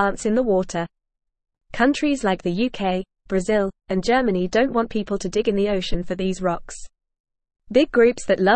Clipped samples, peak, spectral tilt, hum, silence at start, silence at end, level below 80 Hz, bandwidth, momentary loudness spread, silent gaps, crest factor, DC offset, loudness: under 0.1%; -6 dBFS; -5.5 dB/octave; none; 0 s; 0 s; -40 dBFS; 8.8 kHz; 9 LU; 7.20-7.24 s; 16 dB; 0.4%; -22 LUFS